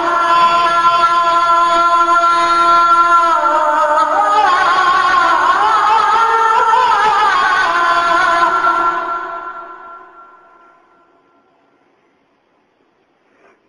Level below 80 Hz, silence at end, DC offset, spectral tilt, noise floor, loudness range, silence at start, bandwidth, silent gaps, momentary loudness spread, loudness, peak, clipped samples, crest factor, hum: -52 dBFS; 3.7 s; under 0.1%; -2 dB/octave; -58 dBFS; 8 LU; 0 s; 10.5 kHz; none; 4 LU; -11 LUFS; 0 dBFS; under 0.1%; 12 dB; none